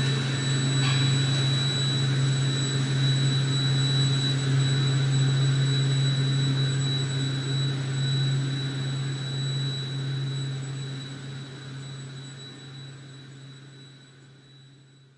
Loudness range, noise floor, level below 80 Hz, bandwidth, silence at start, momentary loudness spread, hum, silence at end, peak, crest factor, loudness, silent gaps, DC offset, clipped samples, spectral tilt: 16 LU; -53 dBFS; -60 dBFS; 10.5 kHz; 0 s; 17 LU; none; 0.5 s; -14 dBFS; 12 dB; -25 LUFS; none; under 0.1%; under 0.1%; -5 dB/octave